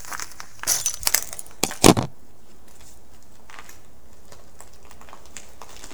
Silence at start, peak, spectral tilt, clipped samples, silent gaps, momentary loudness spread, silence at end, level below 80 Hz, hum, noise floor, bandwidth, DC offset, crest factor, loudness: 0.05 s; 0 dBFS; -3 dB/octave; under 0.1%; none; 27 LU; 0 s; -46 dBFS; none; -52 dBFS; over 20 kHz; 2%; 26 dB; -21 LUFS